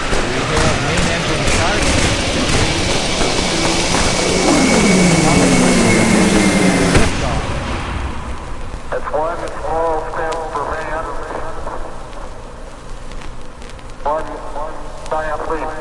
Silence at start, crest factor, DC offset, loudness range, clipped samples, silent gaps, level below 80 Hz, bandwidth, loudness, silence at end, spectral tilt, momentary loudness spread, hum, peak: 0 s; 16 dB; under 0.1%; 15 LU; under 0.1%; none; -26 dBFS; 11.5 kHz; -15 LUFS; 0 s; -4 dB/octave; 21 LU; none; 0 dBFS